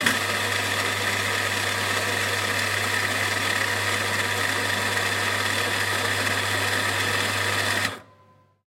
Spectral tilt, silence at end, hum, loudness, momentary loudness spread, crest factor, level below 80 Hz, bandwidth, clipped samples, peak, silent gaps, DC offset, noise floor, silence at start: -2 dB/octave; 0.7 s; none; -23 LUFS; 1 LU; 20 dB; -62 dBFS; 16.5 kHz; under 0.1%; -6 dBFS; none; under 0.1%; -57 dBFS; 0 s